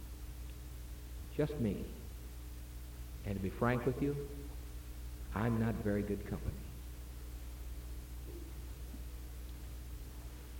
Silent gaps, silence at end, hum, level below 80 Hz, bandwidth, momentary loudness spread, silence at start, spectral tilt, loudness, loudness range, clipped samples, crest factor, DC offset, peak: none; 0 s; none; -46 dBFS; 17 kHz; 14 LU; 0 s; -7 dB/octave; -42 LUFS; 11 LU; under 0.1%; 20 dB; under 0.1%; -20 dBFS